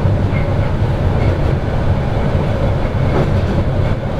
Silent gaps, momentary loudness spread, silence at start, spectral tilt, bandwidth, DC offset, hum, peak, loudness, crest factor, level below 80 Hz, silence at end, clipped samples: none; 2 LU; 0 s; -8.5 dB/octave; 8 kHz; under 0.1%; none; 0 dBFS; -16 LUFS; 14 dB; -20 dBFS; 0 s; under 0.1%